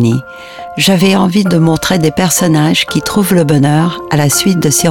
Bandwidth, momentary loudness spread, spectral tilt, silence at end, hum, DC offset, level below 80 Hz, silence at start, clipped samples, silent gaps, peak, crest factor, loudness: 18 kHz; 4 LU; -4.5 dB/octave; 0 s; none; 0.6%; -40 dBFS; 0 s; under 0.1%; none; 0 dBFS; 10 dB; -10 LUFS